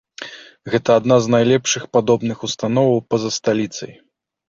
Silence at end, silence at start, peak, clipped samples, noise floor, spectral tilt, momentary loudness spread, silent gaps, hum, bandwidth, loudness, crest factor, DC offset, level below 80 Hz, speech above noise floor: 0.6 s; 0.2 s; -2 dBFS; under 0.1%; -36 dBFS; -5 dB/octave; 19 LU; none; none; 7.8 kHz; -17 LUFS; 16 dB; under 0.1%; -56 dBFS; 19 dB